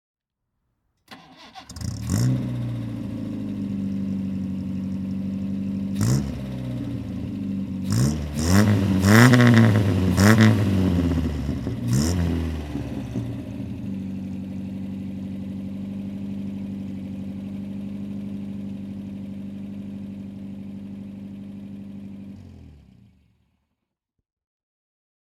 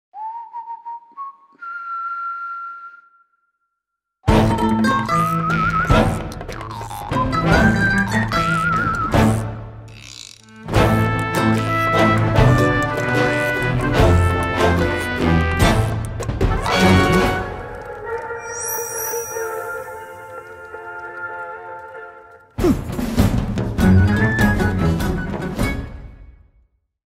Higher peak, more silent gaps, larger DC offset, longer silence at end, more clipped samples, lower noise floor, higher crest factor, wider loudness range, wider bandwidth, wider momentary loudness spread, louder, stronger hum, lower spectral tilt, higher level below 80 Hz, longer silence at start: about the same, 0 dBFS vs -2 dBFS; neither; neither; first, 2.5 s vs 0.75 s; neither; about the same, -80 dBFS vs -79 dBFS; first, 24 dB vs 16 dB; first, 19 LU vs 10 LU; about the same, 16.5 kHz vs 16.5 kHz; about the same, 20 LU vs 19 LU; second, -24 LUFS vs -18 LUFS; neither; about the same, -6.5 dB/octave vs -6 dB/octave; second, -42 dBFS vs -30 dBFS; first, 1.1 s vs 0.15 s